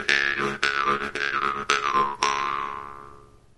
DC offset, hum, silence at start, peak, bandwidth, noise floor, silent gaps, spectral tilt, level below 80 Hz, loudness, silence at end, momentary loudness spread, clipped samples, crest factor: 0.2%; none; 0 s; 0 dBFS; 11.5 kHz; -49 dBFS; none; -2 dB/octave; -54 dBFS; -24 LUFS; 0.3 s; 12 LU; under 0.1%; 26 dB